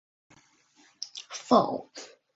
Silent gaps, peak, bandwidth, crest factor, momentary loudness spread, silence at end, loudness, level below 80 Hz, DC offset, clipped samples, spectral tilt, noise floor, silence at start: none; -8 dBFS; 8 kHz; 24 dB; 21 LU; 0.3 s; -28 LUFS; -72 dBFS; under 0.1%; under 0.1%; -4 dB/octave; -63 dBFS; 1 s